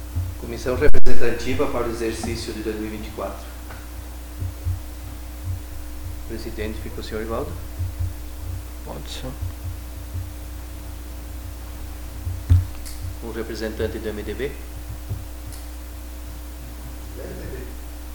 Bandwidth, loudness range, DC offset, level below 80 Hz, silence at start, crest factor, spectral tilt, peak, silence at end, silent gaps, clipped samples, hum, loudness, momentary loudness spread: 19 kHz; 8 LU; under 0.1%; -32 dBFS; 0 s; 18 dB; -6 dB/octave; 0 dBFS; 0 s; none; 0.4%; none; -30 LUFS; 12 LU